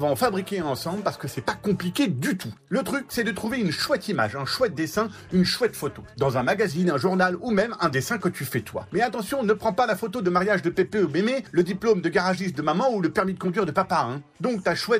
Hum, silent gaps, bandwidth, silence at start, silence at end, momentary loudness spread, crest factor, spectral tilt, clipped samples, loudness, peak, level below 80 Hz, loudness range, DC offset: none; none; 15.5 kHz; 0 s; 0 s; 6 LU; 14 dB; -5.5 dB/octave; under 0.1%; -25 LUFS; -10 dBFS; -56 dBFS; 3 LU; under 0.1%